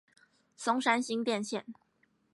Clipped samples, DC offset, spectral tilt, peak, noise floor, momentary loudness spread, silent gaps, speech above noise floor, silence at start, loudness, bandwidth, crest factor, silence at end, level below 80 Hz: under 0.1%; under 0.1%; -3.5 dB/octave; -14 dBFS; -73 dBFS; 11 LU; none; 41 dB; 0.6 s; -32 LUFS; 11.5 kHz; 22 dB; 0.6 s; -84 dBFS